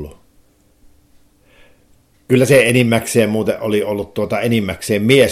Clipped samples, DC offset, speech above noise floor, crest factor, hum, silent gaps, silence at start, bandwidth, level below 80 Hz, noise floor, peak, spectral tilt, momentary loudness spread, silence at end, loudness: under 0.1%; under 0.1%; 39 dB; 16 dB; none; none; 0 s; 16.5 kHz; -48 dBFS; -53 dBFS; 0 dBFS; -5 dB/octave; 10 LU; 0 s; -15 LUFS